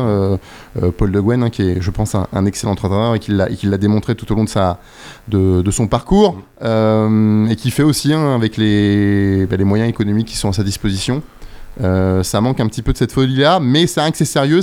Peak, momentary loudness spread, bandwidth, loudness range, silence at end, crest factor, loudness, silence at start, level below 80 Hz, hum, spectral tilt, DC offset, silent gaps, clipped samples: 0 dBFS; 6 LU; 16 kHz; 3 LU; 0 s; 14 dB; -15 LUFS; 0 s; -32 dBFS; none; -6 dB/octave; under 0.1%; none; under 0.1%